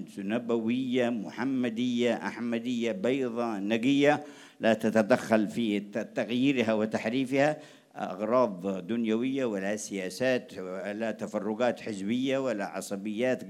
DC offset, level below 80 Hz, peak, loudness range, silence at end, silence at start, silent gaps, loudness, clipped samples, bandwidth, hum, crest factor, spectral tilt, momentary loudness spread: under 0.1%; -80 dBFS; -8 dBFS; 4 LU; 0 s; 0 s; none; -29 LUFS; under 0.1%; 14 kHz; none; 20 dB; -5.5 dB/octave; 9 LU